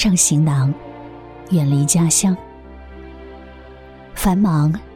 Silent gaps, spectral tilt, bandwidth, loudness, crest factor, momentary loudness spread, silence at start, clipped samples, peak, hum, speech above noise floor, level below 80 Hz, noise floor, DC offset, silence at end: none; -5 dB/octave; 16.5 kHz; -16 LUFS; 16 dB; 24 LU; 0 s; under 0.1%; -2 dBFS; none; 24 dB; -38 dBFS; -39 dBFS; under 0.1%; 0 s